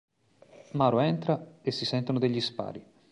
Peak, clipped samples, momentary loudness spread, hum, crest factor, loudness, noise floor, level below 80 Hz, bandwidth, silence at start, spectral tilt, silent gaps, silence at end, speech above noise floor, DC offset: -10 dBFS; under 0.1%; 13 LU; none; 20 dB; -29 LUFS; -57 dBFS; -68 dBFS; 11 kHz; 0.75 s; -7 dB/octave; none; 0.3 s; 29 dB; under 0.1%